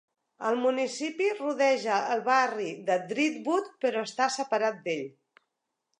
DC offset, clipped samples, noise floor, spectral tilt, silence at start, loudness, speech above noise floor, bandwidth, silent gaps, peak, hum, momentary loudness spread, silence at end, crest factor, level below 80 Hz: under 0.1%; under 0.1%; -83 dBFS; -3.5 dB/octave; 0.4 s; -28 LUFS; 55 dB; 10.5 kHz; none; -10 dBFS; none; 8 LU; 0.9 s; 20 dB; -86 dBFS